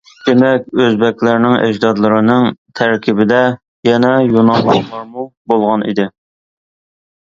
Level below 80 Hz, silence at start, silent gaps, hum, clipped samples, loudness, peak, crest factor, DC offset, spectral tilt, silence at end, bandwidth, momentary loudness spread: -54 dBFS; 0.25 s; 2.58-2.65 s, 3.68-3.83 s, 5.37-5.45 s; none; under 0.1%; -12 LUFS; 0 dBFS; 12 dB; under 0.1%; -7 dB/octave; 1.15 s; 7.4 kHz; 7 LU